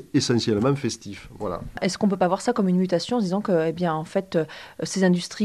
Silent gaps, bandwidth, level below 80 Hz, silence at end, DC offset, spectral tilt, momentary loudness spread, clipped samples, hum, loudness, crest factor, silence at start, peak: none; 12.5 kHz; -52 dBFS; 0 s; under 0.1%; -5.5 dB/octave; 10 LU; under 0.1%; none; -24 LUFS; 16 dB; 0 s; -8 dBFS